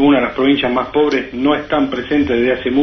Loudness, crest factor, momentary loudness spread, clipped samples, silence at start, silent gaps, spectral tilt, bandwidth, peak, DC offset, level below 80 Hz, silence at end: -15 LUFS; 14 dB; 3 LU; under 0.1%; 0 s; none; -6.5 dB/octave; 6.2 kHz; -2 dBFS; under 0.1%; -42 dBFS; 0 s